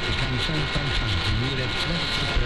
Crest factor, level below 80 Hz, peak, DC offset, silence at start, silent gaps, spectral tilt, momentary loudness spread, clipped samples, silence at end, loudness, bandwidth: 12 dB; -32 dBFS; -12 dBFS; 1%; 0 s; none; -4.5 dB/octave; 1 LU; under 0.1%; 0 s; -24 LUFS; 12.5 kHz